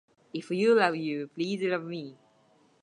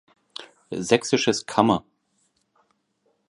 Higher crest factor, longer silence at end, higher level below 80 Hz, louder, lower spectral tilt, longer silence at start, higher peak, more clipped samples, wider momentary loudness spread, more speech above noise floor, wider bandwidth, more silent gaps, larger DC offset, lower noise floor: about the same, 22 dB vs 24 dB; second, 0.7 s vs 1.5 s; second, -84 dBFS vs -60 dBFS; second, -28 LUFS vs -22 LUFS; first, -6 dB/octave vs -4 dB/octave; about the same, 0.35 s vs 0.4 s; second, -8 dBFS vs -2 dBFS; neither; second, 17 LU vs 20 LU; second, 36 dB vs 49 dB; about the same, 10.5 kHz vs 11.5 kHz; neither; neither; second, -64 dBFS vs -70 dBFS